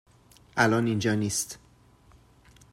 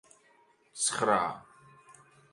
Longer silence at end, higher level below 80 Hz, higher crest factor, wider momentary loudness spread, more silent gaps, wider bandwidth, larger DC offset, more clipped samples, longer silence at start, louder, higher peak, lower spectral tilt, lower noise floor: first, 1.15 s vs 0.4 s; first, -60 dBFS vs -72 dBFS; about the same, 22 dB vs 24 dB; second, 13 LU vs 21 LU; neither; first, 16 kHz vs 11.5 kHz; neither; neither; second, 0.55 s vs 0.75 s; first, -26 LUFS vs -29 LUFS; first, -8 dBFS vs -12 dBFS; first, -4.5 dB/octave vs -2 dB/octave; second, -58 dBFS vs -65 dBFS